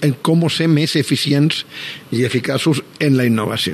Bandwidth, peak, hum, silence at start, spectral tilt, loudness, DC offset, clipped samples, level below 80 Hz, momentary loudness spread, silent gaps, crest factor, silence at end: 13.5 kHz; -4 dBFS; none; 0 s; -5.5 dB/octave; -16 LUFS; under 0.1%; under 0.1%; -60 dBFS; 7 LU; none; 14 dB; 0 s